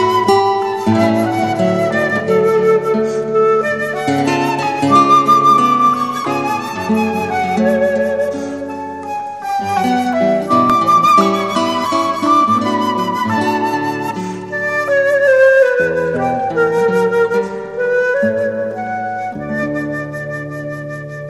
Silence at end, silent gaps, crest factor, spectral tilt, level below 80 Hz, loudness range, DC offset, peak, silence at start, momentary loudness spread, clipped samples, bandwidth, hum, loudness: 0 s; none; 14 dB; -5.5 dB/octave; -54 dBFS; 5 LU; 0.2%; 0 dBFS; 0 s; 13 LU; under 0.1%; 15 kHz; none; -14 LUFS